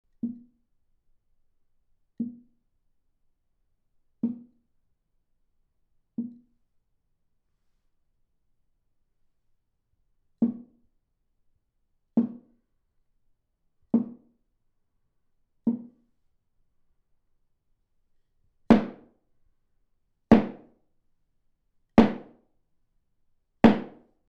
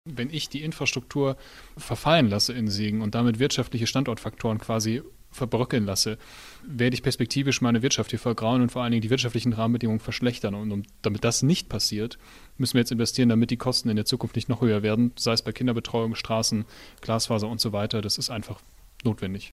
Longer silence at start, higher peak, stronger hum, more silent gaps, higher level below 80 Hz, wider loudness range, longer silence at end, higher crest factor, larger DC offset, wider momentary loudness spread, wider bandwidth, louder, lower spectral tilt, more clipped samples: first, 0.25 s vs 0.05 s; about the same, -6 dBFS vs -6 dBFS; neither; neither; second, -58 dBFS vs -50 dBFS; first, 19 LU vs 3 LU; first, 0.45 s vs 0.05 s; first, 26 dB vs 20 dB; neither; first, 20 LU vs 10 LU; second, 6.4 kHz vs 15.5 kHz; about the same, -26 LUFS vs -25 LUFS; first, -8.5 dB/octave vs -5 dB/octave; neither